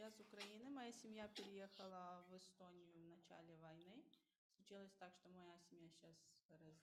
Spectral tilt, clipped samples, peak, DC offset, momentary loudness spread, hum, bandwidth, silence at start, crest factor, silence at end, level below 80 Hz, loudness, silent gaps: -4 dB/octave; under 0.1%; -42 dBFS; under 0.1%; 11 LU; none; 14 kHz; 0 s; 18 dB; 0 s; under -90 dBFS; -61 LUFS; 4.38-4.50 s, 6.45-6.49 s